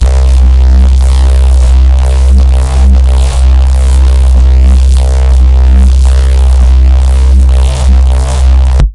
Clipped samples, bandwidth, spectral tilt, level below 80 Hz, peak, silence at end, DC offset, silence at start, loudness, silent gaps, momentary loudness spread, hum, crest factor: under 0.1%; 11 kHz; -6.5 dB/octave; -4 dBFS; 0 dBFS; 0 s; under 0.1%; 0 s; -7 LUFS; none; 2 LU; none; 4 dB